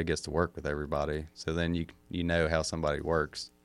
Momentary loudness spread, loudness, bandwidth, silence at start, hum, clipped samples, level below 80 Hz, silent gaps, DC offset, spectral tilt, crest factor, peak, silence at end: 7 LU; -32 LUFS; 12.5 kHz; 0 s; none; under 0.1%; -46 dBFS; none; under 0.1%; -5.5 dB/octave; 20 dB; -12 dBFS; 0.15 s